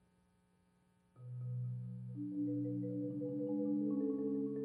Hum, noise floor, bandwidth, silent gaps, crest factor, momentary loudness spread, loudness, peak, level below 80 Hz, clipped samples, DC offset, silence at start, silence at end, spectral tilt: 60 Hz at -75 dBFS; -74 dBFS; 1.9 kHz; none; 12 dB; 10 LU; -40 LUFS; -28 dBFS; -84 dBFS; under 0.1%; under 0.1%; 1.15 s; 0 s; -12.5 dB/octave